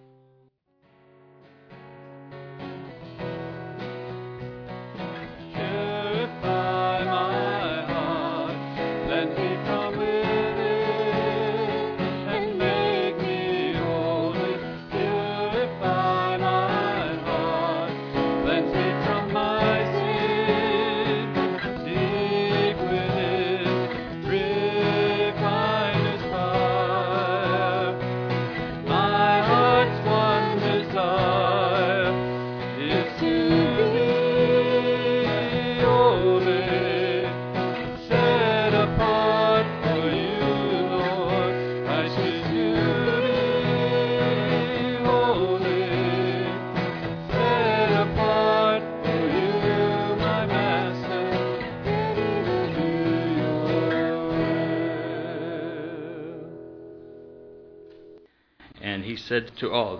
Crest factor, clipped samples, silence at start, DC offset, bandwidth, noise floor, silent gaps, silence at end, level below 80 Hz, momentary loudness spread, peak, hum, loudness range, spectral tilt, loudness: 18 dB; under 0.1%; 1.7 s; under 0.1%; 5.4 kHz; -63 dBFS; none; 0 s; -50 dBFS; 10 LU; -6 dBFS; none; 10 LU; -7.5 dB/octave; -24 LUFS